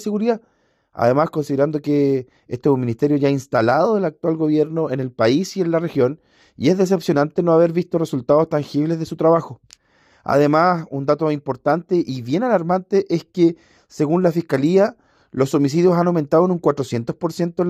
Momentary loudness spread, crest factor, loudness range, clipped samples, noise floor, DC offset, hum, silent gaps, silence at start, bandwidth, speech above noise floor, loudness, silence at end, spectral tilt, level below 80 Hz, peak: 7 LU; 16 dB; 2 LU; under 0.1%; -57 dBFS; under 0.1%; none; none; 0 s; 15 kHz; 39 dB; -19 LUFS; 0 s; -7.5 dB/octave; -62 dBFS; -2 dBFS